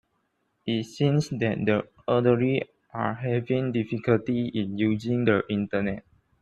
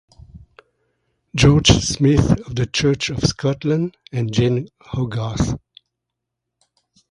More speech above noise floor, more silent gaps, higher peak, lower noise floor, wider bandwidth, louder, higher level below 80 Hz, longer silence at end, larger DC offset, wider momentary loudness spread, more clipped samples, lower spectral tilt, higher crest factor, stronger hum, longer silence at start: second, 48 dB vs 63 dB; neither; second, -8 dBFS vs 0 dBFS; second, -73 dBFS vs -81 dBFS; second, 9.8 kHz vs 11 kHz; second, -26 LUFS vs -18 LUFS; second, -60 dBFS vs -34 dBFS; second, 0.4 s vs 1.55 s; neither; second, 7 LU vs 12 LU; neither; first, -7.5 dB/octave vs -5 dB/octave; about the same, 18 dB vs 20 dB; neither; first, 0.65 s vs 0.35 s